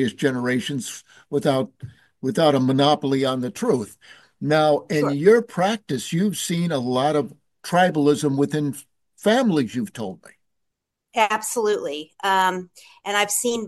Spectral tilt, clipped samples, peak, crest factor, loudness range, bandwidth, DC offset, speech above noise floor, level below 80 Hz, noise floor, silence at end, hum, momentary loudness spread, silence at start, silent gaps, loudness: -5 dB/octave; under 0.1%; -2 dBFS; 20 dB; 4 LU; 12.5 kHz; under 0.1%; 58 dB; -66 dBFS; -80 dBFS; 0 s; none; 13 LU; 0 s; none; -21 LUFS